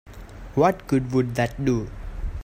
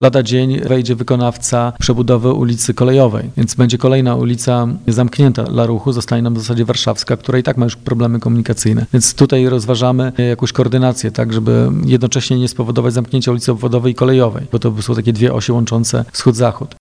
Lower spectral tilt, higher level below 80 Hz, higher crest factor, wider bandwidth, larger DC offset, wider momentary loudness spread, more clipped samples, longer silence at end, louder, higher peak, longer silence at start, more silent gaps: first, -7.5 dB/octave vs -6 dB/octave; about the same, -36 dBFS vs -40 dBFS; first, 18 dB vs 12 dB; first, 16 kHz vs 10.5 kHz; neither; first, 15 LU vs 4 LU; neither; second, 0 s vs 0.15 s; second, -23 LUFS vs -14 LUFS; second, -6 dBFS vs 0 dBFS; about the same, 0.05 s vs 0 s; neither